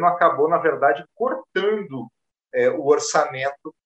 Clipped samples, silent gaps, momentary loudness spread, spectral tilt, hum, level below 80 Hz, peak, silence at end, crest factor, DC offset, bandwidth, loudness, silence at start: under 0.1%; none; 10 LU; -4 dB/octave; none; -74 dBFS; -2 dBFS; 0.15 s; 18 dB; under 0.1%; 8.6 kHz; -21 LUFS; 0 s